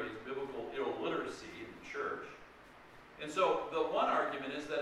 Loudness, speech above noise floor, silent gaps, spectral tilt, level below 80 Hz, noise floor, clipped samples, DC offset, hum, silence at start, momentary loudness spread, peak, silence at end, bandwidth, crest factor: -37 LUFS; 23 dB; none; -4.5 dB/octave; -68 dBFS; -57 dBFS; under 0.1%; under 0.1%; none; 0 s; 23 LU; -20 dBFS; 0 s; 13 kHz; 18 dB